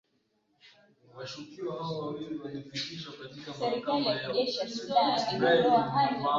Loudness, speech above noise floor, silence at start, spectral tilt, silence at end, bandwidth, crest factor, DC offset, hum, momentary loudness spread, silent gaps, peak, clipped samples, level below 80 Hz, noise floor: -29 LUFS; 44 dB; 0.65 s; -5 dB/octave; 0 s; 7.6 kHz; 18 dB; under 0.1%; none; 17 LU; none; -12 dBFS; under 0.1%; -70 dBFS; -74 dBFS